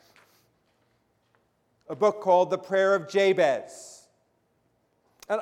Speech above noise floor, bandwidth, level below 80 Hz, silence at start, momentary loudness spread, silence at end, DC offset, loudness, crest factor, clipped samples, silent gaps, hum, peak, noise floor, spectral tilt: 47 dB; 12.5 kHz; -80 dBFS; 1.9 s; 21 LU; 0 s; under 0.1%; -24 LUFS; 18 dB; under 0.1%; none; none; -10 dBFS; -70 dBFS; -4.5 dB/octave